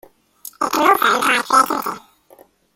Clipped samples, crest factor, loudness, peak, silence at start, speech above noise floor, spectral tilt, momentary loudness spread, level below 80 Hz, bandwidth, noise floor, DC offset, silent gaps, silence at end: under 0.1%; 18 dB; -16 LUFS; -2 dBFS; 0.6 s; 34 dB; -1.5 dB/octave; 22 LU; -62 dBFS; 16.5 kHz; -50 dBFS; under 0.1%; none; 0.8 s